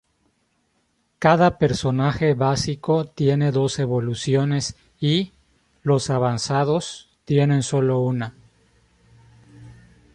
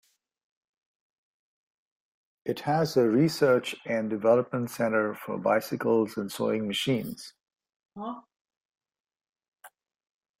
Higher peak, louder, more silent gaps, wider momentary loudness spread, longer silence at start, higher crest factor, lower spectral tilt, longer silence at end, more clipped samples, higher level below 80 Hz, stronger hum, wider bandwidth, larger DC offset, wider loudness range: first, -2 dBFS vs -10 dBFS; first, -21 LUFS vs -27 LUFS; second, none vs 7.76-7.89 s, 8.41-8.45 s, 8.57-8.69 s, 9.00-9.04 s, 9.29-9.33 s, 9.48-9.52 s; second, 8 LU vs 15 LU; second, 1.2 s vs 2.45 s; about the same, 20 dB vs 20 dB; about the same, -6 dB/octave vs -5.5 dB/octave; second, 0.45 s vs 0.75 s; neither; first, -50 dBFS vs -70 dBFS; neither; second, 11 kHz vs 16 kHz; neither; second, 3 LU vs 10 LU